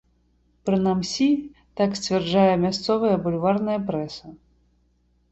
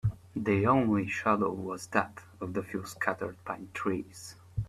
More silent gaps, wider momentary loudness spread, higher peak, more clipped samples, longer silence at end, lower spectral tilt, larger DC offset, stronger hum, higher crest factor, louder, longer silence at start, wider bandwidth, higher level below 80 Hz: neither; second, 11 LU vs 14 LU; first, -4 dBFS vs -12 dBFS; neither; first, 0.95 s vs 0 s; about the same, -6 dB/octave vs -6.5 dB/octave; neither; first, 60 Hz at -50 dBFS vs none; about the same, 18 dB vs 20 dB; first, -23 LUFS vs -31 LUFS; first, 0.65 s vs 0.05 s; second, 8.2 kHz vs 15 kHz; about the same, -56 dBFS vs -56 dBFS